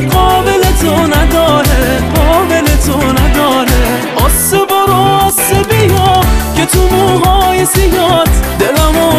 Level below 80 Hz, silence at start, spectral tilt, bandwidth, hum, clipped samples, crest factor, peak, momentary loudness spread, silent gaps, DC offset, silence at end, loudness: -14 dBFS; 0 s; -4.5 dB/octave; 15.5 kHz; none; under 0.1%; 8 dB; 0 dBFS; 3 LU; none; 0.2%; 0 s; -9 LUFS